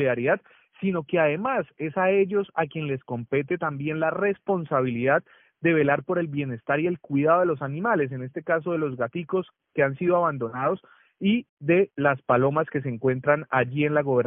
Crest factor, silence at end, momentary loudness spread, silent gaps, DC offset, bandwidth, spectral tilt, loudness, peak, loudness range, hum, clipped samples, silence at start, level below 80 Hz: 18 dB; 0 s; 7 LU; 11.49-11.57 s; under 0.1%; 3.7 kHz; -6 dB/octave; -25 LUFS; -6 dBFS; 2 LU; none; under 0.1%; 0 s; -66 dBFS